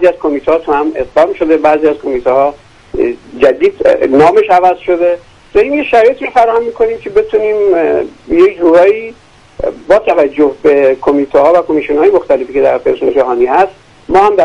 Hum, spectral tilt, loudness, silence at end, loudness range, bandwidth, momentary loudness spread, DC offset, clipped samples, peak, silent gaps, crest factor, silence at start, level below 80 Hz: none; -6.5 dB/octave; -10 LUFS; 0 s; 2 LU; 9.8 kHz; 7 LU; under 0.1%; 0.2%; 0 dBFS; none; 10 dB; 0 s; -40 dBFS